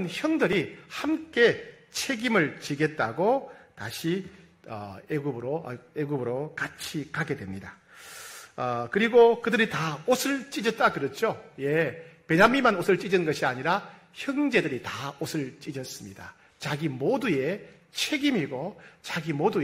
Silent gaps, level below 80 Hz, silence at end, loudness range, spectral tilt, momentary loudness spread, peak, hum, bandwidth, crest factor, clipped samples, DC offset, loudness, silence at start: none; -64 dBFS; 0 s; 8 LU; -5 dB/octave; 17 LU; -6 dBFS; none; 16 kHz; 22 dB; under 0.1%; under 0.1%; -27 LUFS; 0 s